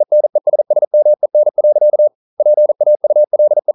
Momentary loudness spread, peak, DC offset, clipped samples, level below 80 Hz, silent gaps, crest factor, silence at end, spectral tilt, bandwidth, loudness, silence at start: 3 LU; -4 dBFS; under 0.1%; under 0.1%; -80 dBFS; 0.87-0.91 s, 2.15-2.37 s; 6 dB; 0.05 s; -11.5 dB/octave; 1.1 kHz; -12 LUFS; 0 s